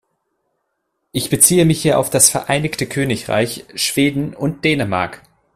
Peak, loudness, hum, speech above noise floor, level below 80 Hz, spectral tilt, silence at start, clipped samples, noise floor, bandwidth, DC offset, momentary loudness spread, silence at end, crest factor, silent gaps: 0 dBFS; -16 LUFS; none; 55 dB; -48 dBFS; -3.5 dB/octave; 1.15 s; under 0.1%; -72 dBFS; 16 kHz; under 0.1%; 11 LU; 0.4 s; 18 dB; none